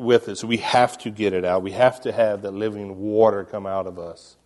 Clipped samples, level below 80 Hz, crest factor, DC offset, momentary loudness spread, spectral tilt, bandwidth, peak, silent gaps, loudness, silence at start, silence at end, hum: under 0.1%; -60 dBFS; 20 dB; under 0.1%; 10 LU; -5 dB/octave; 11.5 kHz; -2 dBFS; none; -22 LUFS; 0 s; 0.3 s; none